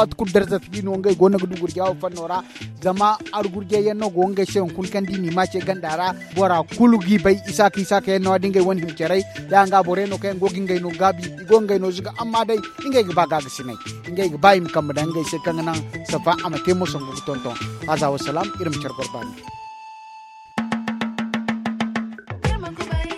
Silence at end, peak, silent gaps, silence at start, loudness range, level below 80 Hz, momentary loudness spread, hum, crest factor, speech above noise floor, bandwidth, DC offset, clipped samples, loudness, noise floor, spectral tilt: 0 s; 0 dBFS; none; 0 s; 8 LU; -42 dBFS; 12 LU; none; 20 dB; 22 dB; 14.5 kHz; under 0.1%; under 0.1%; -21 LUFS; -42 dBFS; -5.5 dB/octave